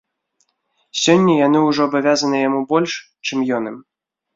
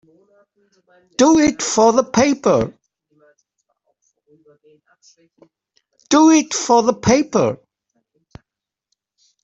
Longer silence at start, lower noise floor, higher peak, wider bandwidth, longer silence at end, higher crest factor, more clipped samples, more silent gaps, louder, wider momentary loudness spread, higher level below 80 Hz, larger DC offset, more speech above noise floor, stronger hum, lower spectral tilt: second, 0.95 s vs 1.2 s; second, -67 dBFS vs -85 dBFS; about the same, -2 dBFS vs -2 dBFS; about the same, 7.8 kHz vs 8.2 kHz; second, 0.55 s vs 1.9 s; about the same, 16 dB vs 18 dB; neither; neither; about the same, -17 LUFS vs -15 LUFS; first, 11 LU vs 8 LU; second, -64 dBFS vs -52 dBFS; neither; second, 51 dB vs 70 dB; neither; about the same, -4.5 dB/octave vs -4 dB/octave